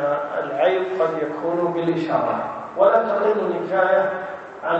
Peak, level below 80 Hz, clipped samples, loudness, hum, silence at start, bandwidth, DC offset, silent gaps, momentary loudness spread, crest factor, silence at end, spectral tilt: -4 dBFS; -66 dBFS; under 0.1%; -21 LUFS; none; 0 s; 7.8 kHz; under 0.1%; none; 9 LU; 16 dB; 0 s; -7.5 dB/octave